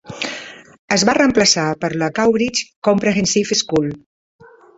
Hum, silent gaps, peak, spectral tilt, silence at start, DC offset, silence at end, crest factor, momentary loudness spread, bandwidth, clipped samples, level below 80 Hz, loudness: none; 0.79-0.88 s, 2.76-2.82 s; 0 dBFS; -3.5 dB/octave; 0.05 s; under 0.1%; 0.8 s; 18 dB; 12 LU; 8.4 kHz; under 0.1%; -50 dBFS; -16 LUFS